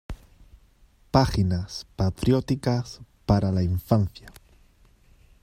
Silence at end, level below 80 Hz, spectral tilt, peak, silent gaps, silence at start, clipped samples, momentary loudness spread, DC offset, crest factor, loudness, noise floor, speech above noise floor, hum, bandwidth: 1.15 s; -42 dBFS; -7.5 dB/octave; -4 dBFS; none; 0.1 s; under 0.1%; 16 LU; under 0.1%; 22 dB; -25 LUFS; -58 dBFS; 34 dB; none; 15.5 kHz